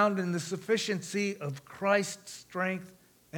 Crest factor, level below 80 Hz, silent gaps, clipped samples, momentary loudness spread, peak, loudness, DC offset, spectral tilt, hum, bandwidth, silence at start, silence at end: 20 dB; -76 dBFS; none; under 0.1%; 12 LU; -12 dBFS; -32 LUFS; under 0.1%; -4.5 dB/octave; none; 20 kHz; 0 s; 0 s